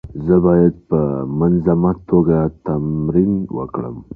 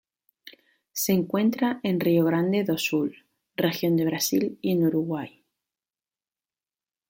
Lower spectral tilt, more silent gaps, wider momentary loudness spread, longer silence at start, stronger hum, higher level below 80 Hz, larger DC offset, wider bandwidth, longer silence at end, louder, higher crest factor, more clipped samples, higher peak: first, -14 dB/octave vs -5.5 dB/octave; neither; about the same, 9 LU vs 10 LU; second, 0.05 s vs 0.45 s; neither; first, -38 dBFS vs -68 dBFS; neither; second, 2.6 kHz vs 17 kHz; second, 0 s vs 1.8 s; first, -17 LUFS vs -25 LUFS; about the same, 14 dB vs 18 dB; neither; first, -2 dBFS vs -10 dBFS